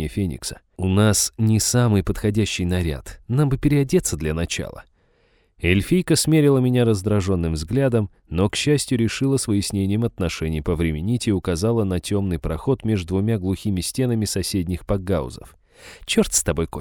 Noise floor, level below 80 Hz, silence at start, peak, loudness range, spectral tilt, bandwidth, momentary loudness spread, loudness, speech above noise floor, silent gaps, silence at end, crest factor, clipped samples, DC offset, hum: -61 dBFS; -38 dBFS; 0 s; -4 dBFS; 3 LU; -5.5 dB/octave; 19.5 kHz; 8 LU; -21 LUFS; 40 dB; none; 0 s; 18 dB; under 0.1%; under 0.1%; none